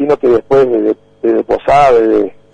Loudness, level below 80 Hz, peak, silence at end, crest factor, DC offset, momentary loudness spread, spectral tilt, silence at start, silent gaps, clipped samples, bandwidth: -11 LUFS; -38 dBFS; -2 dBFS; 0.25 s; 10 dB; under 0.1%; 7 LU; -7 dB/octave; 0 s; none; under 0.1%; 9.6 kHz